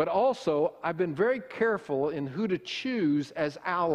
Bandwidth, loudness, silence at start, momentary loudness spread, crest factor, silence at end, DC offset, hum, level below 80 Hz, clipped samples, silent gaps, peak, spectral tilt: 11 kHz; -29 LUFS; 0 s; 5 LU; 14 dB; 0 s; under 0.1%; none; -68 dBFS; under 0.1%; none; -14 dBFS; -6.5 dB/octave